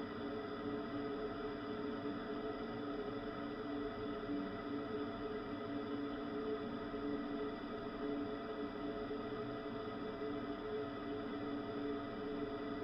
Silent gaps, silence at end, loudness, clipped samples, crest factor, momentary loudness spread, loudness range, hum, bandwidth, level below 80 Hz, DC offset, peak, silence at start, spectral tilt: none; 0 s; -44 LUFS; under 0.1%; 12 dB; 2 LU; 1 LU; none; 6 kHz; -64 dBFS; under 0.1%; -30 dBFS; 0 s; -8 dB/octave